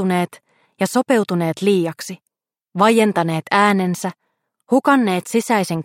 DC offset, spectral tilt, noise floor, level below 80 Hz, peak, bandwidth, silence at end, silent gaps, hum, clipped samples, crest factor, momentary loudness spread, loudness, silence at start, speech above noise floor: under 0.1%; -5.5 dB/octave; -60 dBFS; -68 dBFS; 0 dBFS; 16.5 kHz; 0 s; none; none; under 0.1%; 18 dB; 13 LU; -18 LUFS; 0 s; 42 dB